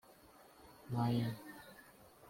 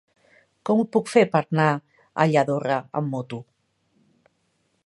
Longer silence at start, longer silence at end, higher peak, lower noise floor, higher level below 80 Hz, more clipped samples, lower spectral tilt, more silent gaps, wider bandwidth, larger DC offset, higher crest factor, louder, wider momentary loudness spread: second, 0.4 s vs 0.65 s; second, 0 s vs 1.45 s; second, -24 dBFS vs -2 dBFS; second, -62 dBFS vs -70 dBFS; about the same, -72 dBFS vs -72 dBFS; neither; about the same, -7.5 dB/octave vs -7 dB/octave; neither; first, 16.5 kHz vs 11.5 kHz; neither; about the same, 18 dB vs 22 dB; second, -39 LUFS vs -22 LUFS; first, 25 LU vs 15 LU